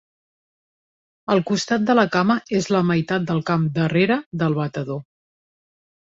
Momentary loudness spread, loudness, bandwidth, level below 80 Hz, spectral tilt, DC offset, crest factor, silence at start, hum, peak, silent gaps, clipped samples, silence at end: 9 LU; -20 LUFS; 7.8 kHz; -60 dBFS; -6 dB/octave; under 0.1%; 20 dB; 1.3 s; none; -2 dBFS; 4.26-4.31 s; under 0.1%; 1.1 s